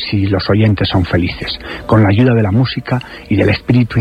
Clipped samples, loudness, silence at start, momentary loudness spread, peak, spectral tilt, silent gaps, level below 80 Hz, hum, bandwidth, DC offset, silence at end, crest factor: under 0.1%; -14 LUFS; 0 s; 9 LU; 0 dBFS; -8.5 dB/octave; none; -34 dBFS; none; 5.2 kHz; under 0.1%; 0 s; 12 dB